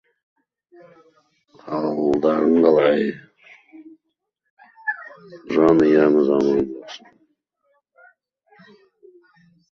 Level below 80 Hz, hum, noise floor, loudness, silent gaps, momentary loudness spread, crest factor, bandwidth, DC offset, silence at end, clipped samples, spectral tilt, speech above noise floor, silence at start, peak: -58 dBFS; none; -76 dBFS; -18 LUFS; 4.50-4.57 s; 21 LU; 20 dB; 7 kHz; under 0.1%; 2.75 s; under 0.1%; -7.5 dB/octave; 59 dB; 1.65 s; -2 dBFS